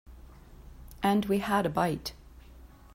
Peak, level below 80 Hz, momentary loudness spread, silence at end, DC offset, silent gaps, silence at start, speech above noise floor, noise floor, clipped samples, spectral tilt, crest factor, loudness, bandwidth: -14 dBFS; -50 dBFS; 13 LU; 0.3 s; under 0.1%; none; 0.1 s; 24 dB; -51 dBFS; under 0.1%; -6 dB/octave; 18 dB; -29 LUFS; 16 kHz